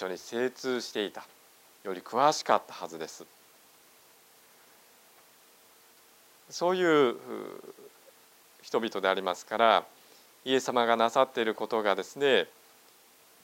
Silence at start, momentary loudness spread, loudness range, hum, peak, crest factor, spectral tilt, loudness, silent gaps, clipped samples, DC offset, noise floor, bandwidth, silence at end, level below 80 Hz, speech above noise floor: 0 s; 18 LU; 9 LU; none; -8 dBFS; 24 dB; -3.5 dB/octave; -28 LUFS; none; under 0.1%; under 0.1%; -59 dBFS; 16 kHz; 0.95 s; -84 dBFS; 31 dB